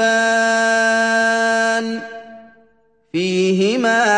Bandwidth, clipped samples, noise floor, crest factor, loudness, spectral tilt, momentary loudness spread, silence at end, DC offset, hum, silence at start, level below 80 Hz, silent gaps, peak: 10.5 kHz; under 0.1%; -58 dBFS; 14 dB; -16 LUFS; -3.5 dB/octave; 12 LU; 0 s; 0.1%; none; 0 s; -66 dBFS; none; -4 dBFS